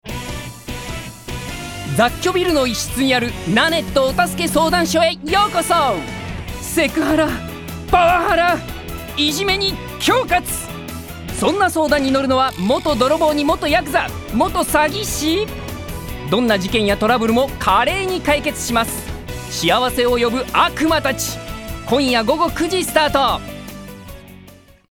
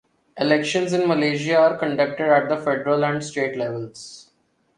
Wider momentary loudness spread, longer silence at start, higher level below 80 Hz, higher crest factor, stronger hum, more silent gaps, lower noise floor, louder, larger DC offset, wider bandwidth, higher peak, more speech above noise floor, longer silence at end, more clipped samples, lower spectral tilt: first, 14 LU vs 11 LU; second, 0.05 s vs 0.35 s; first, -36 dBFS vs -66 dBFS; about the same, 16 dB vs 18 dB; neither; neither; second, -44 dBFS vs -65 dBFS; first, -17 LUFS vs -21 LUFS; first, 0.1% vs under 0.1%; first, over 20 kHz vs 11 kHz; about the same, -2 dBFS vs -4 dBFS; second, 27 dB vs 44 dB; second, 0.35 s vs 0.55 s; neither; about the same, -4 dB/octave vs -5 dB/octave